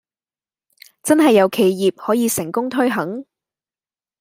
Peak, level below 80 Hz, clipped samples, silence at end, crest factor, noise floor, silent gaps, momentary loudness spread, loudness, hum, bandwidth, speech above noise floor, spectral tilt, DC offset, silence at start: -2 dBFS; -66 dBFS; under 0.1%; 1 s; 18 dB; under -90 dBFS; none; 13 LU; -17 LUFS; none; 16 kHz; over 74 dB; -4.5 dB/octave; under 0.1%; 1.05 s